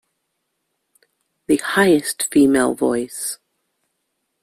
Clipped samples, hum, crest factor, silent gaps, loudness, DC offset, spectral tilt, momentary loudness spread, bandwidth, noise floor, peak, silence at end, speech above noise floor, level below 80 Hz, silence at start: under 0.1%; none; 18 dB; none; -18 LUFS; under 0.1%; -4 dB/octave; 12 LU; 15.5 kHz; -74 dBFS; -2 dBFS; 1.05 s; 57 dB; -58 dBFS; 1.5 s